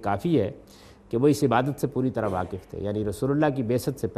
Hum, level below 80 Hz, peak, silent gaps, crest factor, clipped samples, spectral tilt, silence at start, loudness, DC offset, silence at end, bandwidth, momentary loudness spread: none; -54 dBFS; -8 dBFS; none; 18 dB; under 0.1%; -7 dB/octave; 0 s; -26 LUFS; under 0.1%; 0 s; 14.5 kHz; 10 LU